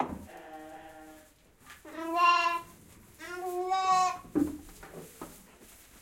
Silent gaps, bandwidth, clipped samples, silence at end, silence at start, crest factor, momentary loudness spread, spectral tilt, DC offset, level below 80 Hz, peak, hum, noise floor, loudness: none; 16.5 kHz; under 0.1%; 0.35 s; 0 s; 20 dB; 24 LU; -3.5 dB/octave; under 0.1%; -62 dBFS; -14 dBFS; none; -59 dBFS; -29 LUFS